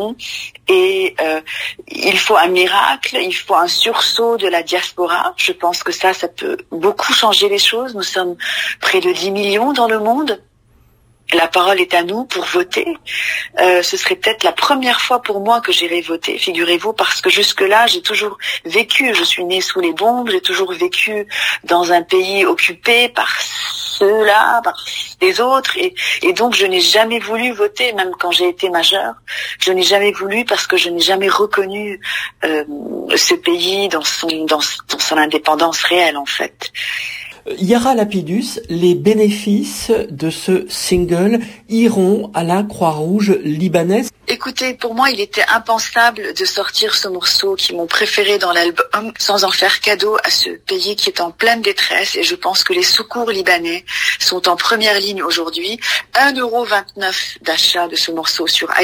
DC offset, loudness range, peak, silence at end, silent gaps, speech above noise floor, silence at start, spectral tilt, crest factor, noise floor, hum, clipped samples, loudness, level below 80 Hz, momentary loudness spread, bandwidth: under 0.1%; 3 LU; 0 dBFS; 0 s; none; 36 dB; 0 s; -2.5 dB/octave; 16 dB; -51 dBFS; none; under 0.1%; -14 LUFS; -52 dBFS; 8 LU; 16 kHz